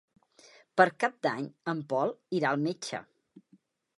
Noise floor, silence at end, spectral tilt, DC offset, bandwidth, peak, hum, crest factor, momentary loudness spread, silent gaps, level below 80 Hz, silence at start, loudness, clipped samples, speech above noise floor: -66 dBFS; 0.95 s; -5.5 dB/octave; under 0.1%; 11.5 kHz; -6 dBFS; none; 26 dB; 11 LU; none; -80 dBFS; 0.75 s; -30 LUFS; under 0.1%; 36 dB